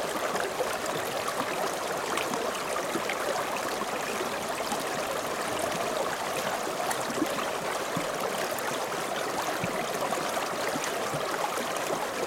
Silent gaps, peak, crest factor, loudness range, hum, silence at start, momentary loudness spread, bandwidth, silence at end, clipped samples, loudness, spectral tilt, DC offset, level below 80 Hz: none; -12 dBFS; 18 dB; 0 LU; none; 0 s; 1 LU; 17.5 kHz; 0 s; under 0.1%; -30 LUFS; -2.5 dB/octave; under 0.1%; -62 dBFS